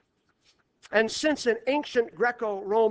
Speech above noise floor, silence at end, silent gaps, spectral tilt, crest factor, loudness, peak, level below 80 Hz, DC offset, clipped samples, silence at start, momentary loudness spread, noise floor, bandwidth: 42 dB; 0 s; none; -3 dB/octave; 20 dB; -26 LUFS; -8 dBFS; -66 dBFS; under 0.1%; under 0.1%; 0.9 s; 3 LU; -68 dBFS; 8 kHz